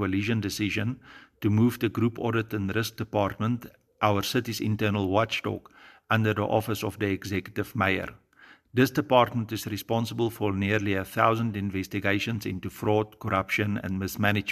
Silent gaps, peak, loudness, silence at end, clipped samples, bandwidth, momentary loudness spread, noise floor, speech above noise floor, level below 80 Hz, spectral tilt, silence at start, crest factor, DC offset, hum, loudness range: none; -4 dBFS; -27 LUFS; 0 s; under 0.1%; 14.5 kHz; 8 LU; -56 dBFS; 29 dB; -58 dBFS; -6 dB/octave; 0 s; 22 dB; under 0.1%; none; 2 LU